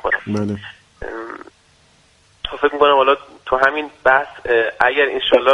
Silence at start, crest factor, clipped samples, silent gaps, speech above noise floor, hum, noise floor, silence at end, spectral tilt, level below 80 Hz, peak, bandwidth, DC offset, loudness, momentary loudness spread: 0.05 s; 18 dB; under 0.1%; none; 38 dB; none; -54 dBFS; 0 s; -5.5 dB/octave; -46 dBFS; 0 dBFS; 10.5 kHz; under 0.1%; -16 LUFS; 17 LU